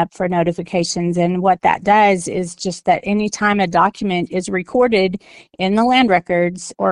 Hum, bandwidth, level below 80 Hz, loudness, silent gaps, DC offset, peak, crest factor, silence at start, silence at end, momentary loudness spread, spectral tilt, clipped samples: none; 11.5 kHz; -50 dBFS; -17 LUFS; none; under 0.1%; 0 dBFS; 16 dB; 0 s; 0 s; 9 LU; -5 dB/octave; under 0.1%